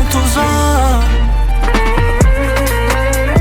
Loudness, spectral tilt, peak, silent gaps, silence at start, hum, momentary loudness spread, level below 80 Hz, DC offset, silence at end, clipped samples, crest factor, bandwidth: -13 LUFS; -5 dB/octave; 0 dBFS; none; 0 s; none; 3 LU; -14 dBFS; under 0.1%; 0 s; under 0.1%; 10 dB; 18 kHz